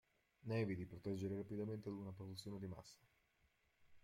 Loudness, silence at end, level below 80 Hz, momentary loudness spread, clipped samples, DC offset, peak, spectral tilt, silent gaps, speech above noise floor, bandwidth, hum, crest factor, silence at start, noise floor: -48 LUFS; 0.05 s; -76 dBFS; 11 LU; under 0.1%; under 0.1%; -32 dBFS; -7 dB/octave; none; 33 dB; 16 kHz; none; 18 dB; 0.45 s; -80 dBFS